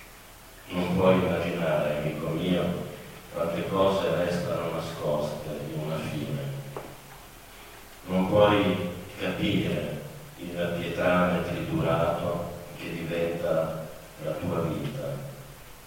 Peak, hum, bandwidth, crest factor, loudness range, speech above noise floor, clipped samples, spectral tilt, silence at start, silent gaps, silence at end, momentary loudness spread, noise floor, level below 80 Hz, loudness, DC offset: -8 dBFS; none; 16.5 kHz; 22 dB; 5 LU; 22 dB; under 0.1%; -6.5 dB/octave; 0 s; none; 0 s; 20 LU; -48 dBFS; -52 dBFS; -28 LUFS; under 0.1%